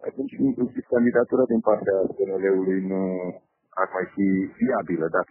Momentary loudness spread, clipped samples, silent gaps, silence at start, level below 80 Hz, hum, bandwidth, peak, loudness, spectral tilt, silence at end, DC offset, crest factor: 7 LU; under 0.1%; none; 0 s; -64 dBFS; none; 3.1 kHz; -6 dBFS; -24 LUFS; -9.5 dB/octave; 0.05 s; under 0.1%; 18 dB